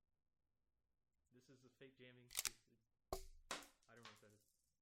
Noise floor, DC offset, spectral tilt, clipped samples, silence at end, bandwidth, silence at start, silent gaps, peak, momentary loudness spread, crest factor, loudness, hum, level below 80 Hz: -78 dBFS; under 0.1%; -1 dB/octave; under 0.1%; 0.45 s; 16.5 kHz; 1.3 s; none; -22 dBFS; 20 LU; 36 dB; -50 LUFS; none; -70 dBFS